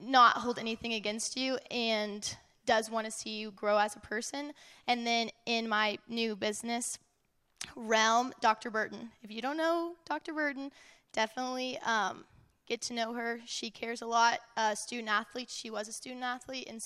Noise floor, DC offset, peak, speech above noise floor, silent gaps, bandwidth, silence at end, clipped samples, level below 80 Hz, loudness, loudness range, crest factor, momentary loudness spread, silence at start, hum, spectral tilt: -75 dBFS; under 0.1%; -12 dBFS; 41 dB; none; 15 kHz; 0 s; under 0.1%; -74 dBFS; -33 LUFS; 3 LU; 22 dB; 12 LU; 0 s; none; -2 dB/octave